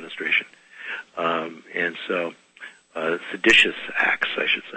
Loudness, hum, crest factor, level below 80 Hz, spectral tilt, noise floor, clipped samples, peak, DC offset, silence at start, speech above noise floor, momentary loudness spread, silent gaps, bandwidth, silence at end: -21 LUFS; none; 22 dB; -62 dBFS; -2.5 dB/octave; -45 dBFS; under 0.1%; -2 dBFS; under 0.1%; 0 s; 22 dB; 22 LU; none; 8.8 kHz; 0 s